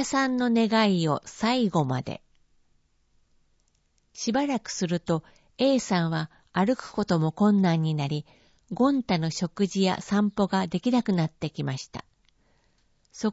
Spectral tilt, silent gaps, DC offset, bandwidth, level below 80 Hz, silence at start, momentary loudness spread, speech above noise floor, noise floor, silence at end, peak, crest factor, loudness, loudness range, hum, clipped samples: -6 dB/octave; none; under 0.1%; 8 kHz; -60 dBFS; 0 s; 10 LU; 43 dB; -68 dBFS; 0 s; -10 dBFS; 18 dB; -26 LUFS; 6 LU; none; under 0.1%